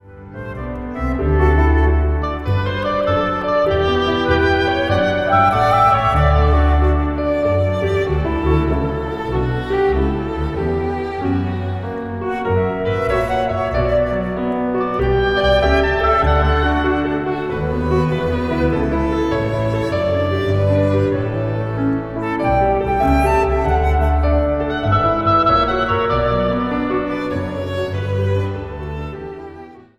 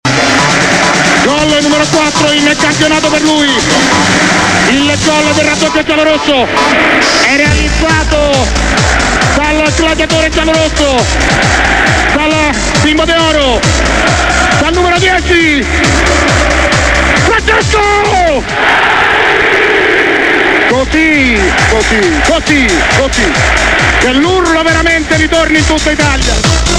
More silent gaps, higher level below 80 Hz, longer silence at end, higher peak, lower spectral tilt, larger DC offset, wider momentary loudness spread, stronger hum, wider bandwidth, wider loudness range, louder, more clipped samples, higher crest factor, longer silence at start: neither; about the same, -24 dBFS vs -20 dBFS; first, 0.2 s vs 0 s; about the same, -2 dBFS vs 0 dBFS; first, -8 dB/octave vs -3.5 dB/octave; neither; first, 8 LU vs 2 LU; neither; about the same, 11.5 kHz vs 11 kHz; first, 5 LU vs 1 LU; second, -17 LUFS vs -8 LUFS; second, under 0.1% vs 0.3%; first, 16 dB vs 8 dB; about the same, 0.05 s vs 0.05 s